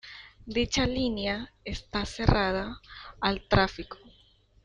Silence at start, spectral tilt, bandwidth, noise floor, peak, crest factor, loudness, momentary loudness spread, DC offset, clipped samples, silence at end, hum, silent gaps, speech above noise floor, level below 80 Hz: 0.05 s; -5 dB/octave; 10.5 kHz; -61 dBFS; -6 dBFS; 24 dB; -29 LUFS; 19 LU; under 0.1%; under 0.1%; 0.7 s; none; none; 33 dB; -40 dBFS